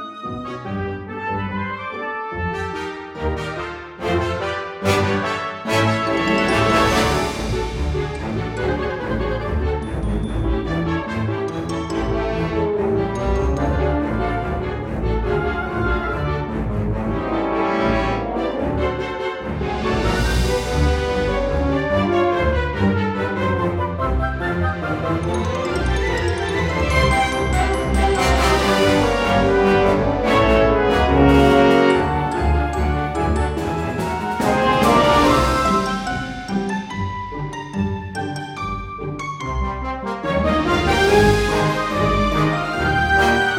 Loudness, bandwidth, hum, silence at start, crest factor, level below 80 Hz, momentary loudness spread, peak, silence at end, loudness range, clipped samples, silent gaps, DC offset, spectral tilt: -20 LUFS; 16.5 kHz; none; 0 s; 18 dB; -28 dBFS; 11 LU; -2 dBFS; 0 s; 8 LU; under 0.1%; none; under 0.1%; -6 dB/octave